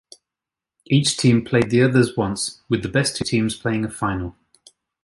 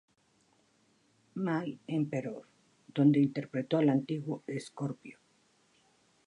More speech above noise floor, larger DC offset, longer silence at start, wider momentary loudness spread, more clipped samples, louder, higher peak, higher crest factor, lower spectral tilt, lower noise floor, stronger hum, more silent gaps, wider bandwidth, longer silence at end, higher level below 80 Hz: first, 68 dB vs 39 dB; neither; second, 0.9 s vs 1.35 s; second, 8 LU vs 17 LU; neither; first, -20 LUFS vs -32 LUFS; first, -4 dBFS vs -14 dBFS; about the same, 16 dB vs 20 dB; second, -5 dB/octave vs -8 dB/octave; first, -88 dBFS vs -71 dBFS; neither; neither; about the same, 11.5 kHz vs 11 kHz; second, 0.75 s vs 1.15 s; first, -48 dBFS vs -82 dBFS